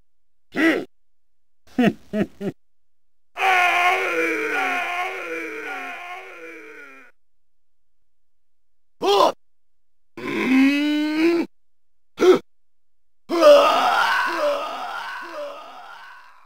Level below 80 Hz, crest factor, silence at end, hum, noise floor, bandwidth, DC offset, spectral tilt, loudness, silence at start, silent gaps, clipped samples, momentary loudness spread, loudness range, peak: -66 dBFS; 22 dB; 0.3 s; none; -78 dBFS; 16 kHz; 0.4%; -4.5 dB/octave; -20 LUFS; 0.55 s; none; under 0.1%; 19 LU; 12 LU; 0 dBFS